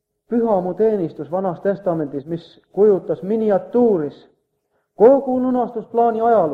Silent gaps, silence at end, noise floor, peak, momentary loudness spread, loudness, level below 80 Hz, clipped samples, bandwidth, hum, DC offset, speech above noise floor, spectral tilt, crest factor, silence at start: none; 0 s; -69 dBFS; 0 dBFS; 11 LU; -18 LUFS; -60 dBFS; under 0.1%; 4.7 kHz; none; under 0.1%; 52 dB; -10 dB/octave; 18 dB; 0.3 s